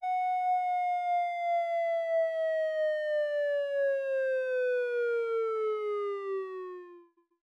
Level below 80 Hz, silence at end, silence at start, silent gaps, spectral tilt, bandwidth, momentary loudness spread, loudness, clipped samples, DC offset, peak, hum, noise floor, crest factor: under -90 dBFS; 0.45 s; 0 s; none; -1 dB/octave; 9 kHz; 5 LU; -31 LUFS; under 0.1%; under 0.1%; -22 dBFS; none; -57 dBFS; 8 dB